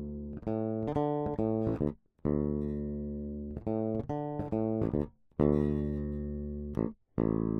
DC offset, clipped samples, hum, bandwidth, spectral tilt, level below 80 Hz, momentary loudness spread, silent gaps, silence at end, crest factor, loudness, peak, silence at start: under 0.1%; under 0.1%; none; 4.1 kHz; -11.5 dB/octave; -46 dBFS; 8 LU; none; 0 s; 18 dB; -34 LUFS; -14 dBFS; 0 s